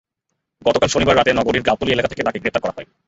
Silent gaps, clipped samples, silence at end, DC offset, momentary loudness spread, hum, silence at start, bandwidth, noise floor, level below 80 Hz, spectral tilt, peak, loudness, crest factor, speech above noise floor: none; under 0.1%; 0.25 s; under 0.1%; 8 LU; none; 0.65 s; 8 kHz; -76 dBFS; -42 dBFS; -4.5 dB/octave; 0 dBFS; -18 LUFS; 18 dB; 59 dB